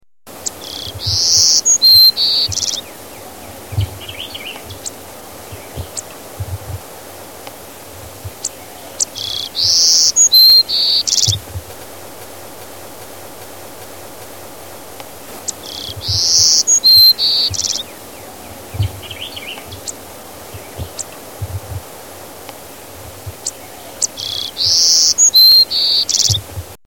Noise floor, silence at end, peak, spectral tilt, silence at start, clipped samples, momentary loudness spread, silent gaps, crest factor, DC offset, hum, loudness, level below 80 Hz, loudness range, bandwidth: -34 dBFS; 0.1 s; 0 dBFS; -0.5 dB/octave; 0.25 s; under 0.1%; 27 LU; none; 16 dB; 0.5%; none; -9 LUFS; -42 dBFS; 20 LU; 17.5 kHz